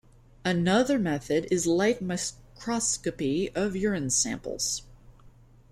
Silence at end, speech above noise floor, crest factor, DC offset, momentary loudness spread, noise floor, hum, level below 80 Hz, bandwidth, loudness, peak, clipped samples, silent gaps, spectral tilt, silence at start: 0.4 s; 27 dB; 20 dB; under 0.1%; 8 LU; -54 dBFS; none; -52 dBFS; 14.5 kHz; -27 LUFS; -8 dBFS; under 0.1%; none; -4 dB/octave; 0.45 s